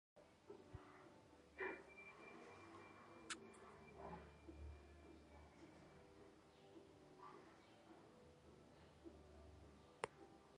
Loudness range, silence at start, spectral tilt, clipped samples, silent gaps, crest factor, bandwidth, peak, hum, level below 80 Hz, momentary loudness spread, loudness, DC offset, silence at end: 9 LU; 0.15 s; -4 dB/octave; under 0.1%; none; 36 dB; 11 kHz; -24 dBFS; none; -72 dBFS; 13 LU; -60 LUFS; under 0.1%; 0 s